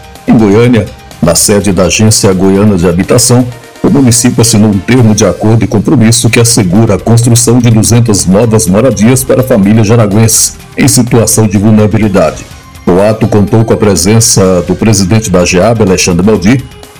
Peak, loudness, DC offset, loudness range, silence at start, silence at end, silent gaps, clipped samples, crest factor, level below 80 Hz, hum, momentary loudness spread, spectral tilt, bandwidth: 0 dBFS; -6 LUFS; 3%; 1 LU; 0 s; 0 s; none; 10%; 6 dB; -30 dBFS; none; 4 LU; -5 dB/octave; over 20 kHz